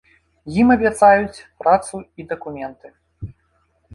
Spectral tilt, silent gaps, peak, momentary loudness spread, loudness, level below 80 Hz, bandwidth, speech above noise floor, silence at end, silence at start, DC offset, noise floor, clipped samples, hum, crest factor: -6 dB/octave; none; -2 dBFS; 24 LU; -17 LUFS; -46 dBFS; 11.5 kHz; 46 dB; 0.65 s; 0.45 s; under 0.1%; -64 dBFS; under 0.1%; none; 18 dB